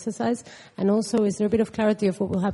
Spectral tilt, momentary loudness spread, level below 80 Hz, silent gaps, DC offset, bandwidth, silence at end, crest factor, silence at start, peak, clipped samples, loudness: -6.5 dB/octave; 5 LU; -58 dBFS; none; under 0.1%; 11.5 kHz; 0 s; 14 dB; 0 s; -10 dBFS; under 0.1%; -24 LUFS